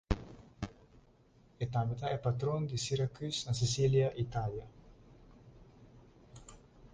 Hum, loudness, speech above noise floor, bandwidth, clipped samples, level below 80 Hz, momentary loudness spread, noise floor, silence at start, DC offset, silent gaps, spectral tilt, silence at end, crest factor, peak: none; -35 LUFS; 31 dB; 9.8 kHz; under 0.1%; -52 dBFS; 25 LU; -64 dBFS; 0.1 s; under 0.1%; none; -5.5 dB/octave; 0.05 s; 22 dB; -16 dBFS